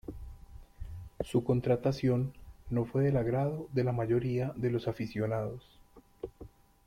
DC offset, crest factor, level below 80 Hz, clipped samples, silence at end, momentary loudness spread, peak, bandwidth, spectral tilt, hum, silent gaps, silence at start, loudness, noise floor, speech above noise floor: under 0.1%; 16 dB; -52 dBFS; under 0.1%; 0.4 s; 18 LU; -16 dBFS; 13 kHz; -8.5 dB/octave; none; none; 0.1 s; -32 LUFS; -53 dBFS; 23 dB